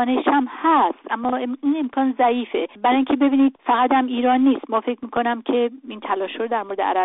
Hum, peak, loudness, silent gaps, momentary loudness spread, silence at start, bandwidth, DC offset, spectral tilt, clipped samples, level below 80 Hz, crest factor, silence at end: none; -6 dBFS; -20 LUFS; none; 8 LU; 0 s; 4 kHz; under 0.1%; -2 dB/octave; under 0.1%; -64 dBFS; 14 dB; 0 s